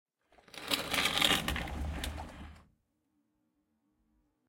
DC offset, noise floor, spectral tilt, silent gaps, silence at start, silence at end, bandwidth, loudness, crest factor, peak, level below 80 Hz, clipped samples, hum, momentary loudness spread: under 0.1%; -78 dBFS; -2.5 dB/octave; none; 0.55 s; 1.85 s; 17 kHz; -32 LUFS; 28 dB; -8 dBFS; -48 dBFS; under 0.1%; none; 23 LU